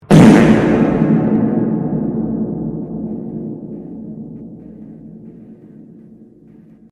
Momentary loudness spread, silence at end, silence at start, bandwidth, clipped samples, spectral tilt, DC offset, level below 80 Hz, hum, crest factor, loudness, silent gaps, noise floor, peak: 27 LU; 1.1 s; 0.1 s; 12 kHz; 0.1%; -7.5 dB/octave; under 0.1%; -40 dBFS; none; 16 dB; -14 LUFS; none; -43 dBFS; 0 dBFS